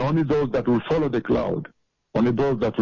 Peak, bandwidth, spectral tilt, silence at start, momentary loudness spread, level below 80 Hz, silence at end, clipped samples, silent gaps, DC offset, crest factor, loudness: -12 dBFS; 7.2 kHz; -8.5 dB/octave; 0 s; 8 LU; -46 dBFS; 0 s; under 0.1%; none; under 0.1%; 10 dB; -23 LUFS